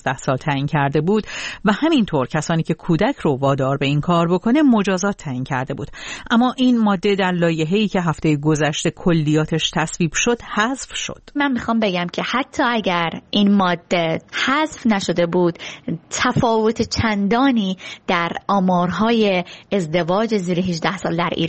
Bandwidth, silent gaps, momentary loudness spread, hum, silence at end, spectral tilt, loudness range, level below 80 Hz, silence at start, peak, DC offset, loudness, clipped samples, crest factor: 8.8 kHz; none; 7 LU; none; 0 s; -5.5 dB/octave; 2 LU; -46 dBFS; 0.05 s; -2 dBFS; under 0.1%; -19 LUFS; under 0.1%; 18 dB